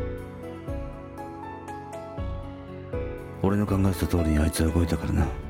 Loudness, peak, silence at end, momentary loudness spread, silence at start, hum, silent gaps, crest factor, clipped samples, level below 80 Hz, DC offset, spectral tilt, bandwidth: -28 LUFS; -10 dBFS; 0 s; 14 LU; 0 s; none; none; 18 dB; under 0.1%; -36 dBFS; under 0.1%; -7 dB/octave; 17 kHz